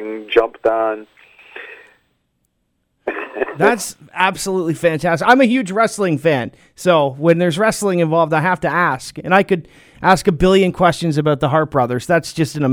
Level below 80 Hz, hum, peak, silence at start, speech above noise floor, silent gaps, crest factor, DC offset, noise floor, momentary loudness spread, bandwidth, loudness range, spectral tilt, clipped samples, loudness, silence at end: -44 dBFS; none; 0 dBFS; 0 s; 52 dB; none; 16 dB; under 0.1%; -68 dBFS; 12 LU; 19.5 kHz; 7 LU; -5.5 dB/octave; under 0.1%; -16 LUFS; 0 s